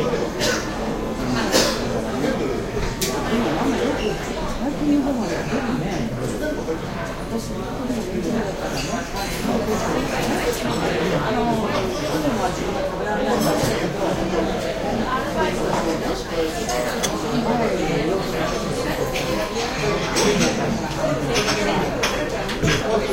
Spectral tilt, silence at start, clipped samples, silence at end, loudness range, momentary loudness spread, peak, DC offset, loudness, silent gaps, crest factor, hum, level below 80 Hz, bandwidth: -4.5 dB/octave; 0 s; under 0.1%; 0 s; 4 LU; 6 LU; -4 dBFS; under 0.1%; -22 LUFS; none; 18 dB; none; -36 dBFS; 16 kHz